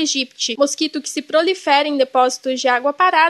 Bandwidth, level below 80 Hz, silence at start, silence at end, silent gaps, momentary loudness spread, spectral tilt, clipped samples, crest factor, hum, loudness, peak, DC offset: 12.5 kHz; -78 dBFS; 0 s; 0 s; none; 6 LU; -0.5 dB/octave; under 0.1%; 16 dB; none; -17 LUFS; -2 dBFS; under 0.1%